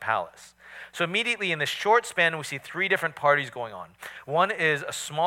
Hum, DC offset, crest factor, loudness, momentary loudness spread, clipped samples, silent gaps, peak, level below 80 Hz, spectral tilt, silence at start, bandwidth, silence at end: none; under 0.1%; 20 dB; -25 LUFS; 18 LU; under 0.1%; none; -8 dBFS; -72 dBFS; -3 dB/octave; 0 s; 17 kHz; 0 s